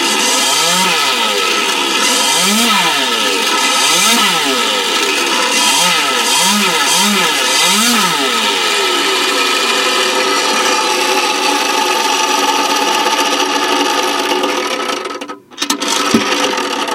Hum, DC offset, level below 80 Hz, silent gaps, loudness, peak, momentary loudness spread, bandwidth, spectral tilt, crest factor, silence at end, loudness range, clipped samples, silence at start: none; under 0.1%; -62 dBFS; none; -11 LUFS; 0 dBFS; 5 LU; 16 kHz; -0.5 dB/octave; 14 dB; 0 s; 4 LU; under 0.1%; 0 s